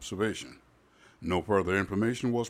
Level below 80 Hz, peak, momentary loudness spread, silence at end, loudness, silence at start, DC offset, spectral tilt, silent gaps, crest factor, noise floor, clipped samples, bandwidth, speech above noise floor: -58 dBFS; -12 dBFS; 14 LU; 0 s; -30 LUFS; 0 s; under 0.1%; -5.5 dB/octave; none; 18 dB; -60 dBFS; under 0.1%; 15 kHz; 31 dB